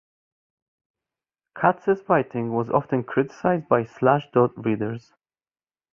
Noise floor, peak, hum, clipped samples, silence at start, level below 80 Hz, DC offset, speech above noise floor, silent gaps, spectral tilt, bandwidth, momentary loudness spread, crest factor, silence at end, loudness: under -90 dBFS; -2 dBFS; none; under 0.1%; 1.55 s; -62 dBFS; under 0.1%; over 68 dB; none; -9 dB/octave; 7 kHz; 6 LU; 22 dB; 0.95 s; -23 LUFS